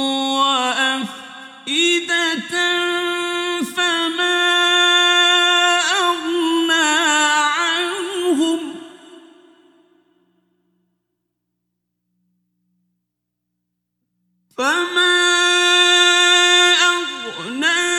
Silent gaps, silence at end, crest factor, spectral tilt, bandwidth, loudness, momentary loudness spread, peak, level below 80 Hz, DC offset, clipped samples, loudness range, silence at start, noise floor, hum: none; 0 s; 18 dB; 0 dB/octave; 15.5 kHz; -15 LUFS; 11 LU; -2 dBFS; -76 dBFS; under 0.1%; under 0.1%; 11 LU; 0 s; -78 dBFS; 60 Hz at -65 dBFS